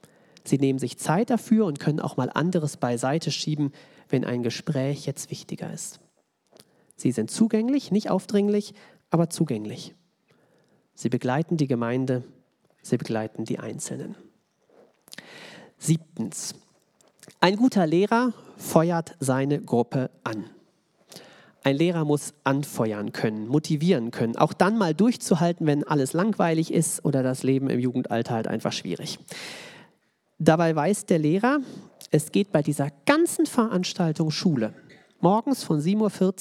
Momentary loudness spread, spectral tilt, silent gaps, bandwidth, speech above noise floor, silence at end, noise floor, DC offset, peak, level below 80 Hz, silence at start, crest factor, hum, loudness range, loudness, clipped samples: 13 LU; -6 dB/octave; none; 15.5 kHz; 44 dB; 0 s; -68 dBFS; under 0.1%; 0 dBFS; -76 dBFS; 0.45 s; 26 dB; none; 7 LU; -25 LUFS; under 0.1%